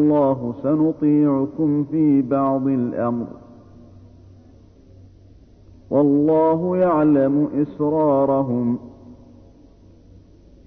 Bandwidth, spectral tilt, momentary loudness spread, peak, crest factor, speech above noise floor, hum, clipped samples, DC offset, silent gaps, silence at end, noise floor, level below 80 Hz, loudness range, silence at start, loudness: 3.6 kHz; -12 dB/octave; 7 LU; -6 dBFS; 14 dB; 30 dB; none; under 0.1%; under 0.1%; none; 1.55 s; -48 dBFS; -54 dBFS; 8 LU; 0 s; -19 LUFS